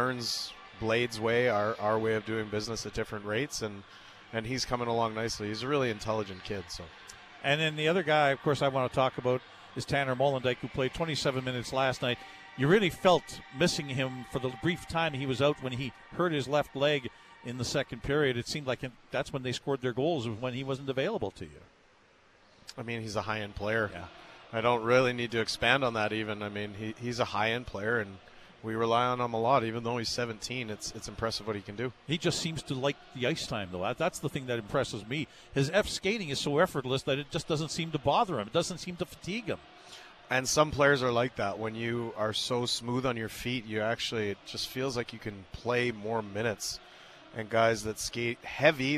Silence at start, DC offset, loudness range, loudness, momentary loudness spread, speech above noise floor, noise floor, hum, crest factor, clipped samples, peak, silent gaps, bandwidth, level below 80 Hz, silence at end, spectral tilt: 0 s; under 0.1%; 5 LU; -31 LUFS; 12 LU; 31 dB; -62 dBFS; none; 22 dB; under 0.1%; -8 dBFS; none; 14 kHz; -56 dBFS; 0 s; -4.5 dB/octave